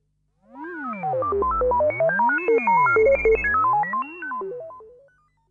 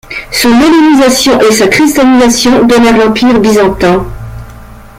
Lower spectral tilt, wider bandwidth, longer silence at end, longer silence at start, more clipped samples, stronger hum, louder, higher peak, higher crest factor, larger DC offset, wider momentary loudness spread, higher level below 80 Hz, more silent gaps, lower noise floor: first, -8 dB/octave vs -4 dB/octave; second, 7 kHz vs 16.5 kHz; first, 0.65 s vs 0.2 s; first, 0.55 s vs 0.1 s; neither; first, 50 Hz at -55 dBFS vs none; second, -21 LUFS vs -6 LUFS; second, -10 dBFS vs 0 dBFS; first, 12 dB vs 6 dB; neither; first, 16 LU vs 8 LU; second, -44 dBFS vs -30 dBFS; neither; first, -63 dBFS vs -29 dBFS